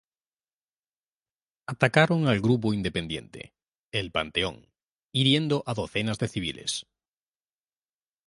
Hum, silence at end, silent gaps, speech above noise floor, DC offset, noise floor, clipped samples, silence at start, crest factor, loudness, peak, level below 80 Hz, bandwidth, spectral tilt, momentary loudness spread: none; 1.45 s; 3.79-3.91 s, 4.83-4.87 s, 5.03-5.08 s; over 64 dB; under 0.1%; under -90 dBFS; under 0.1%; 1.7 s; 24 dB; -26 LUFS; -4 dBFS; -54 dBFS; 11.5 kHz; -5 dB/octave; 13 LU